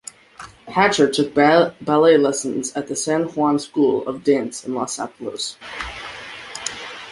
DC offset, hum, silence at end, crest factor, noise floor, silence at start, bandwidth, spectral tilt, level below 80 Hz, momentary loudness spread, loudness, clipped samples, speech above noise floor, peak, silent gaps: under 0.1%; none; 0 s; 18 dB; -42 dBFS; 0.4 s; 11.5 kHz; -4 dB/octave; -54 dBFS; 18 LU; -19 LUFS; under 0.1%; 23 dB; -2 dBFS; none